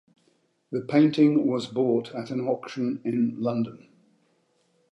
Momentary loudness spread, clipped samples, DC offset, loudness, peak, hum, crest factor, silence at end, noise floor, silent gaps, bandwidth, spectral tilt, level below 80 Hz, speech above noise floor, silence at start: 12 LU; under 0.1%; under 0.1%; -25 LUFS; -8 dBFS; none; 18 dB; 1.15 s; -68 dBFS; none; 8.4 kHz; -7.5 dB/octave; -76 dBFS; 44 dB; 0.7 s